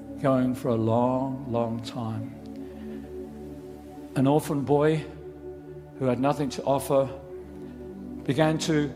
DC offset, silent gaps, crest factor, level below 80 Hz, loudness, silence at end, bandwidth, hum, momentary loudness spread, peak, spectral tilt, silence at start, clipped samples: under 0.1%; none; 20 dB; -54 dBFS; -26 LUFS; 0 s; 16 kHz; none; 18 LU; -8 dBFS; -6.5 dB/octave; 0 s; under 0.1%